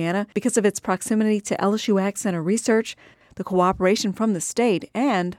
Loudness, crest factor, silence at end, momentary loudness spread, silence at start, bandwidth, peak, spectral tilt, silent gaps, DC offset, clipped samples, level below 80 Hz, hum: -22 LUFS; 16 dB; 0.05 s; 5 LU; 0 s; 15.5 kHz; -6 dBFS; -5 dB/octave; none; under 0.1%; under 0.1%; -56 dBFS; none